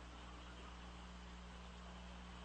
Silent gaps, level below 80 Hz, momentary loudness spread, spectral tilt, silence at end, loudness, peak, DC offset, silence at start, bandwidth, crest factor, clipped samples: none; -58 dBFS; 1 LU; -4.5 dB/octave; 0 s; -55 LUFS; -42 dBFS; under 0.1%; 0 s; 9.4 kHz; 12 dB; under 0.1%